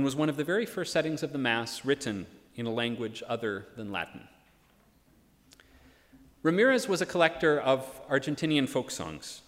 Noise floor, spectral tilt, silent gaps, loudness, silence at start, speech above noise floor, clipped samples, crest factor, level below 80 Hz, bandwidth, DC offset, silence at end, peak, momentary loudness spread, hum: -64 dBFS; -4.5 dB/octave; none; -30 LUFS; 0 s; 34 dB; under 0.1%; 22 dB; -66 dBFS; 16 kHz; under 0.1%; 0.1 s; -8 dBFS; 12 LU; none